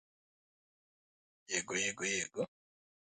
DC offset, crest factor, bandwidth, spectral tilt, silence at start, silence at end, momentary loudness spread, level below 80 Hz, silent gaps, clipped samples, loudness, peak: under 0.1%; 22 dB; 9.4 kHz; -1.5 dB/octave; 1.5 s; 0.6 s; 8 LU; -76 dBFS; none; under 0.1%; -36 LUFS; -20 dBFS